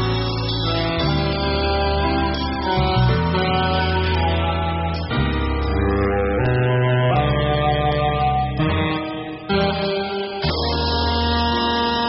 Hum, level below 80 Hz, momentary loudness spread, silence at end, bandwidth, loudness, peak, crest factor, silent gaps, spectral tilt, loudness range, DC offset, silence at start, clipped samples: none; -28 dBFS; 5 LU; 0 s; 5.8 kHz; -20 LUFS; -6 dBFS; 12 dB; none; -4.5 dB/octave; 2 LU; under 0.1%; 0 s; under 0.1%